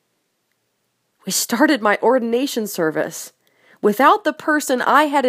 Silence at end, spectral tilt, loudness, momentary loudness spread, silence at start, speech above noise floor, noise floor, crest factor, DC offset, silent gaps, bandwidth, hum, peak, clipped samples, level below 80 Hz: 0 s; -3 dB/octave; -17 LUFS; 11 LU; 1.25 s; 53 dB; -70 dBFS; 18 dB; under 0.1%; none; 15.5 kHz; none; 0 dBFS; under 0.1%; -74 dBFS